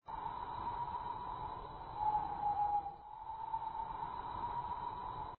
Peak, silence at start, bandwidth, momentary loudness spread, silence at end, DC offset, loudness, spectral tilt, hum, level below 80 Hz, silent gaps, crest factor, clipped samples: -26 dBFS; 0.05 s; 4.3 kHz; 9 LU; 0.05 s; under 0.1%; -41 LUFS; -4 dB/octave; none; -60 dBFS; none; 16 dB; under 0.1%